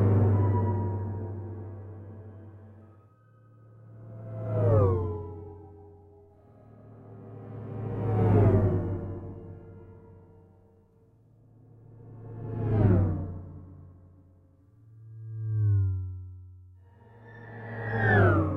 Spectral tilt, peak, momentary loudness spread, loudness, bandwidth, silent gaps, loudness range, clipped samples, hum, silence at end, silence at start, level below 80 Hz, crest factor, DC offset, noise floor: -11 dB/octave; -10 dBFS; 26 LU; -27 LUFS; 3.7 kHz; none; 12 LU; under 0.1%; none; 0 s; 0 s; -48 dBFS; 20 dB; under 0.1%; -60 dBFS